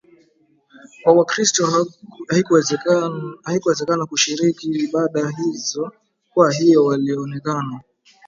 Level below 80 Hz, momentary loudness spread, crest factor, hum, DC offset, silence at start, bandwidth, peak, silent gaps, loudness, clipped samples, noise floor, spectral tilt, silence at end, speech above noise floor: -66 dBFS; 11 LU; 18 dB; none; under 0.1%; 1.05 s; 7.8 kHz; 0 dBFS; none; -18 LUFS; under 0.1%; -59 dBFS; -4.5 dB/octave; 0.5 s; 41 dB